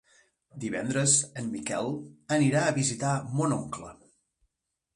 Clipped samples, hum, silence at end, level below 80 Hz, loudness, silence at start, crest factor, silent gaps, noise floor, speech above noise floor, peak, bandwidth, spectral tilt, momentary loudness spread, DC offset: under 0.1%; none; 1 s; -64 dBFS; -27 LUFS; 0.55 s; 20 dB; none; -83 dBFS; 54 dB; -10 dBFS; 11.5 kHz; -4 dB/octave; 16 LU; under 0.1%